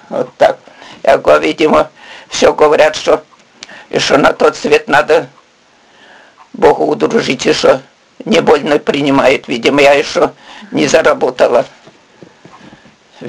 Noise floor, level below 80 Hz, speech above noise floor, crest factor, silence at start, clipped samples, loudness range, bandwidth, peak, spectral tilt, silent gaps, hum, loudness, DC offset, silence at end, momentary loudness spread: -48 dBFS; -46 dBFS; 38 dB; 12 dB; 0.1 s; 0.3%; 3 LU; 12 kHz; 0 dBFS; -4 dB/octave; none; none; -11 LUFS; under 0.1%; 0 s; 9 LU